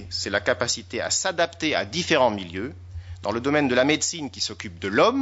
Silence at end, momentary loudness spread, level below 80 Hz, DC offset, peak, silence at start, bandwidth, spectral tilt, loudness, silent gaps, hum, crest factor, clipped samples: 0 s; 12 LU; -52 dBFS; under 0.1%; -4 dBFS; 0 s; 8 kHz; -3 dB/octave; -24 LUFS; none; none; 20 dB; under 0.1%